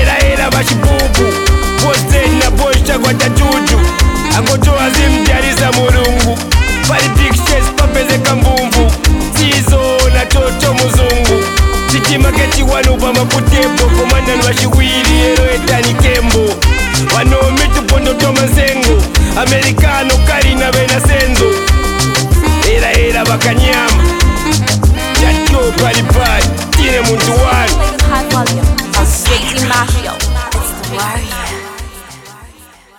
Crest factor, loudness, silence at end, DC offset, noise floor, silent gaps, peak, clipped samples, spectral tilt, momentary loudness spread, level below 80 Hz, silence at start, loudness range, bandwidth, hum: 10 dB; -10 LUFS; 0.5 s; under 0.1%; -39 dBFS; none; 0 dBFS; under 0.1%; -4 dB/octave; 3 LU; -14 dBFS; 0 s; 1 LU; 19 kHz; none